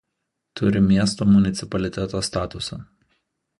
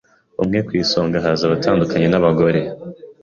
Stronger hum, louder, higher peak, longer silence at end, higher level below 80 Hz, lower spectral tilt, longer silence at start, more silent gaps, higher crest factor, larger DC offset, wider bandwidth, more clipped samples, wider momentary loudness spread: neither; second, -21 LUFS vs -17 LUFS; second, -6 dBFS vs -2 dBFS; first, 0.75 s vs 0.1 s; about the same, -44 dBFS vs -46 dBFS; about the same, -6 dB/octave vs -6.5 dB/octave; first, 0.55 s vs 0.4 s; neither; about the same, 16 dB vs 14 dB; neither; first, 11.5 kHz vs 7.2 kHz; neither; about the same, 14 LU vs 15 LU